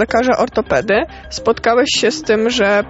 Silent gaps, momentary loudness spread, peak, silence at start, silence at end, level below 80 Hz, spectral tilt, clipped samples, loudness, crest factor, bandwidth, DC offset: none; 5 LU; -2 dBFS; 0 s; 0 s; -40 dBFS; -3.5 dB/octave; under 0.1%; -15 LUFS; 14 dB; 8.2 kHz; under 0.1%